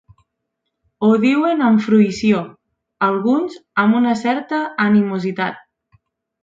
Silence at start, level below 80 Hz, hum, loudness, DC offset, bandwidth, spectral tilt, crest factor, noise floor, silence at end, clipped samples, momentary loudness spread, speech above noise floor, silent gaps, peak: 1 s; -60 dBFS; none; -17 LUFS; under 0.1%; 7.6 kHz; -7 dB/octave; 14 dB; -76 dBFS; 0.85 s; under 0.1%; 8 LU; 60 dB; none; -2 dBFS